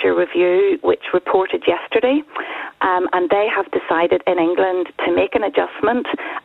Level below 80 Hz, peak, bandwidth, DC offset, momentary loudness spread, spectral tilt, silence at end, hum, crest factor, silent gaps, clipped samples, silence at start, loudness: -56 dBFS; -4 dBFS; 4.1 kHz; under 0.1%; 5 LU; -7 dB/octave; 0.05 s; none; 14 dB; none; under 0.1%; 0 s; -18 LUFS